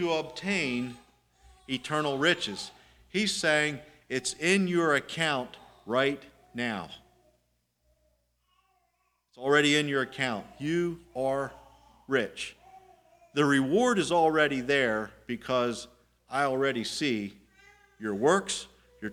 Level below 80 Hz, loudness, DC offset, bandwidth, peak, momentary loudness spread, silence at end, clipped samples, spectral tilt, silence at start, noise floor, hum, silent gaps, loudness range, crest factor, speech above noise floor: -64 dBFS; -28 LUFS; under 0.1%; 16 kHz; -8 dBFS; 15 LU; 0 s; under 0.1%; -4 dB/octave; 0 s; -75 dBFS; 60 Hz at -60 dBFS; none; 6 LU; 22 dB; 47 dB